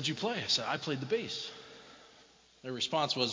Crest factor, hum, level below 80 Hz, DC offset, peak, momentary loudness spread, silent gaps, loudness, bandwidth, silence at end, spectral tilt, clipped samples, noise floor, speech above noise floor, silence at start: 20 dB; none; -74 dBFS; under 0.1%; -16 dBFS; 20 LU; none; -33 LUFS; 7.6 kHz; 0 s; -3.5 dB/octave; under 0.1%; -61 dBFS; 27 dB; 0 s